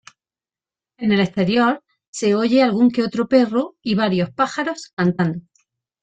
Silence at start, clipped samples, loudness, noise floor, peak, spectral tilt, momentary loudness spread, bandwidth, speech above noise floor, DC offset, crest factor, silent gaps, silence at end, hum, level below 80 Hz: 1 s; under 0.1%; -19 LUFS; under -90 dBFS; -4 dBFS; -6 dB/octave; 9 LU; 9.2 kHz; over 72 dB; under 0.1%; 16 dB; 2.08-2.13 s, 4.93-4.97 s; 0.6 s; none; -58 dBFS